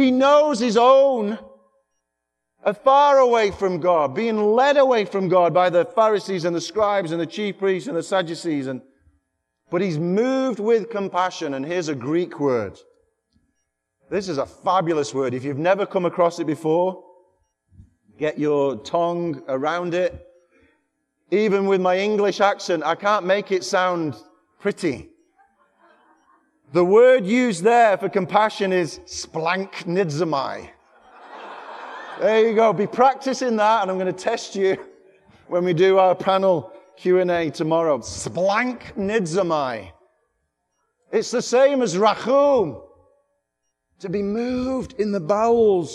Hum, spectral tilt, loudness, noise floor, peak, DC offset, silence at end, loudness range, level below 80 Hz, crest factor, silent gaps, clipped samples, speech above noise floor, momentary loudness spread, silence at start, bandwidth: none; -5.5 dB/octave; -20 LUFS; -79 dBFS; -2 dBFS; under 0.1%; 0 s; 7 LU; -60 dBFS; 20 dB; none; under 0.1%; 60 dB; 12 LU; 0 s; 11.5 kHz